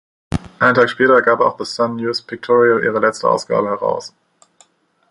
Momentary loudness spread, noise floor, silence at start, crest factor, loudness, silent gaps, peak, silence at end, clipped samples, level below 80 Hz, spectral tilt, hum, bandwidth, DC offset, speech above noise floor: 14 LU; -54 dBFS; 0.3 s; 16 dB; -16 LUFS; none; -2 dBFS; 1 s; under 0.1%; -46 dBFS; -5 dB/octave; none; 11 kHz; under 0.1%; 39 dB